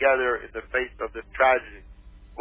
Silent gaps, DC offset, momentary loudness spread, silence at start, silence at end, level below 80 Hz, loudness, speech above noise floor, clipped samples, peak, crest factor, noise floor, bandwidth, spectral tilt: none; under 0.1%; 16 LU; 0 s; 0 s; -48 dBFS; -25 LUFS; 21 dB; under 0.1%; -8 dBFS; 18 dB; -46 dBFS; 3.7 kHz; -7.5 dB/octave